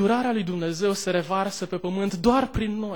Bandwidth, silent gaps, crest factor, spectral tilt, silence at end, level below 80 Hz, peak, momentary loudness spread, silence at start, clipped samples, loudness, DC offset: 19 kHz; none; 18 dB; -5.5 dB/octave; 0 s; -44 dBFS; -6 dBFS; 6 LU; 0 s; under 0.1%; -25 LUFS; 0.3%